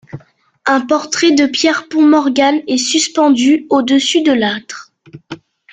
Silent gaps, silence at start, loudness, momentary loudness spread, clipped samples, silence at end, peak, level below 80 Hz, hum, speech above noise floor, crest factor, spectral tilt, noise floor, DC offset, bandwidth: none; 0.15 s; -12 LUFS; 20 LU; under 0.1%; 0.4 s; 0 dBFS; -58 dBFS; none; 31 dB; 12 dB; -2.5 dB/octave; -43 dBFS; under 0.1%; 9.4 kHz